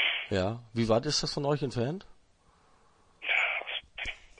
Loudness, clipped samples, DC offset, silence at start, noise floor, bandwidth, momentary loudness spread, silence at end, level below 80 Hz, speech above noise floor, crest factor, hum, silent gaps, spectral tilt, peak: -30 LUFS; under 0.1%; under 0.1%; 0 s; -64 dBFS; 10.5 kHz; 11 LU; 0.2 s; -56 dBFS; 34 dB; 18 dB; none; none; -4 dB/octave; -14 dBFS